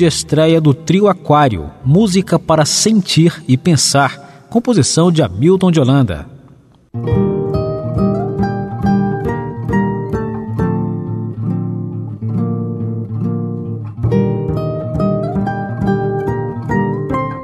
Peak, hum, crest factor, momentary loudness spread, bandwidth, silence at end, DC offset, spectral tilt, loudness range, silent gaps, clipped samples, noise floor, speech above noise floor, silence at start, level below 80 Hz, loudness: 0 dBFS; none; 14 dB; 10 LU; 13.5 kHz; 0 s; under 0.1%; -5.5 dB/octave; 7 LU; none; under 0.1%; -44 dBFS; 33 dB; 0 s; -36 dBFS; -15 LUFS